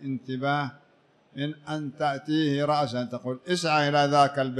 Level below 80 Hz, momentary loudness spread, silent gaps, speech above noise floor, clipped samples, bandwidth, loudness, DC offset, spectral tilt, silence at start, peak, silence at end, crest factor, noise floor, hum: -72 dBFS; 12 LU; none; 36 dB; under 0.1%; 12 kHz; -26 LUFS; under 0.1%; -5.5 dB/octave; 0 s; -8 dBFS; 0 s; 18 dB; -62 dBFS; none